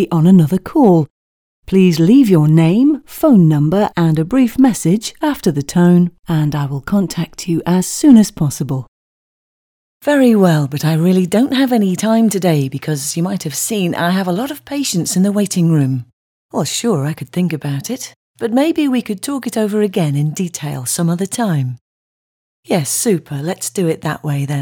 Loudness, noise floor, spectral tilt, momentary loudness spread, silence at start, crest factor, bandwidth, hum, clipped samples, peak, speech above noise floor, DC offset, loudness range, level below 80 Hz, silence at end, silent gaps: -15 LUFS; under -90 dBFS; -6 dB/octave; 11 LU; 0 s; 14 dB; 19 kHz; none; under 0.1%; 0 dBFS; over 76 dB; under 0.1%; 6 LU; -48 dBFS; 0 s; 1.10-1.63 s, 8.88-10.00 s, 16.13-16.49 s, 18.16-18.34 s, 21.81-22.63 s